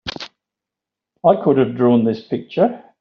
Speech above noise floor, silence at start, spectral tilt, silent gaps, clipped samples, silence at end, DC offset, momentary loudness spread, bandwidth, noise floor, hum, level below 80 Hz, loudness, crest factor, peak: 69 dB; 0.05 s; -6 dB/octave; none; under 0.1%; 0.2 s; under 0.1%; 14 LU; 6.8 kHz; -85 dBFS; none; -56 dBFS; -17 LUFS; 16 dB; -2 dBFS